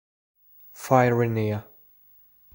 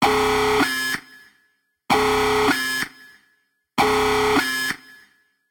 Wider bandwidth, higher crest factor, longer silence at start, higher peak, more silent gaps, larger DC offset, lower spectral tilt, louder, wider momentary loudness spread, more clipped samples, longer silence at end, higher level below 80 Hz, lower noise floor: second, 17.5 kHz vs 19.5 kHz; first, 22 dB vs 16 dB; first, 0.75 s vs 0 s; about the same, -4 dBFS vs -6 dBFS; neither; neither; first, -7.5 dB/octave vs -3 dB/octave; second, -23 LUFS vs -20 LUFS; first, 14 LU vs 9 LU; neither; first, 0.9 s vs 0.75 s; second, -64 dBFS vs -46 dBFS; second, -56 dBFS vs -67 dBFS